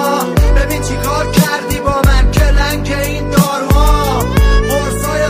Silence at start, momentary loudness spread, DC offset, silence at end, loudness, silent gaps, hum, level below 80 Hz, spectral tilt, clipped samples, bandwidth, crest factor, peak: 0 s; 5 LU; under 0.1%; 0 s; -13 LUFS; none; none; -14 dBFS; -5 dB/octave; under 0.1%; 16 kHz; 12 dB; 0 dBFS